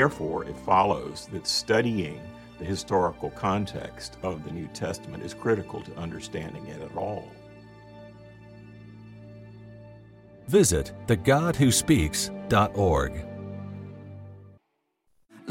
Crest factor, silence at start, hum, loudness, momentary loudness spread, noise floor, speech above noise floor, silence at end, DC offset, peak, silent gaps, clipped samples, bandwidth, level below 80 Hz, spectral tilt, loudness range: 20 dB; 0 s; none; -26 LUFS; 25 LU; -75 dBFS; 49 dB; 0 s; under 0.1%; -8 dBFS; none; under 0.1%; 16.5 kHz; -46 dBFS; -4.5 dB/octave; 15 LU